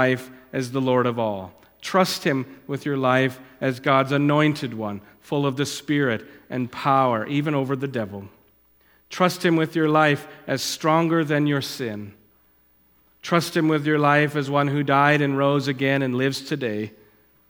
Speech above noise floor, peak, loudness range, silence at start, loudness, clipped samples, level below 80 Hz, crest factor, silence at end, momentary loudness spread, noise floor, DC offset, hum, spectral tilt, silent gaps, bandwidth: 38 dB; -2 dBFS; 4 LU; 0 s; -22 LUFS; under 0.1%; -66 dBFS; 22 dB; 0.6 s; 13 LU; -60 dBFS; under 0.1%; none; -5.5 dB/octave; none; 18.5 kHz